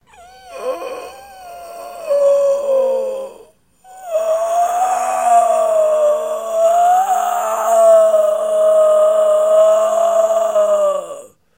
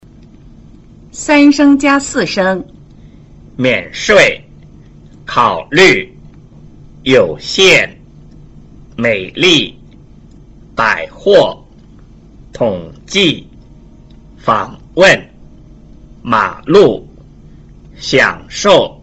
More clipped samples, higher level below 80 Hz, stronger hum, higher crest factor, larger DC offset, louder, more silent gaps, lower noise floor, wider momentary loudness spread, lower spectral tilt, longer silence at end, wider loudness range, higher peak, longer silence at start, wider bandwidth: neither; second, -62 dBFS vs -40 dBFS; neither; about the same, 12 dB vs 14 dB; neither; second, -14 LUFS vs -11 LUFS; neither; first, -47 dBFS vs -39 dBFS; about the same, 18 LU vs 16 LU; second, -1.5 dB/octave vs -4 dB/octave; first, 0.35 s vs 0.1 s; first, 7 LU vs 4 LU; about the same, -2 dBFS vs 0 dBFS; second, 0.45 s vs 1.15 s; first, 16 kHz vs 8.2 kHz